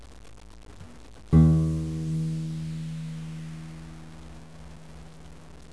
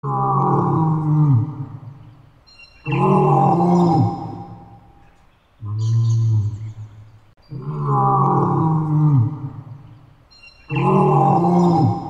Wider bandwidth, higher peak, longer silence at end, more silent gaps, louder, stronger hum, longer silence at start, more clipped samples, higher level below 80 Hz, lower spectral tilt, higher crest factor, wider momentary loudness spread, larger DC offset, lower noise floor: first, 11 kHz vs 7.6 kHz; second, -8 dBFS vs -4 dBFS; about the same, 0 s vs 0 s; neither; second, -26 LUFS vs -17 LUFS; first, 60 Hz at -50 dBFS vs none; about the same, 0 s vs 0.05 s; neither; first, -40 dBFS vs -50 dBFS; about the same, -8.5 dB/octave vs -9.5 dB/octave; first, 20 dB vs 14 dB; first, 27 LU vs 18 LU; first, 0.4% vs under 0.1%; second, -47 dBFS vs -53 dBFS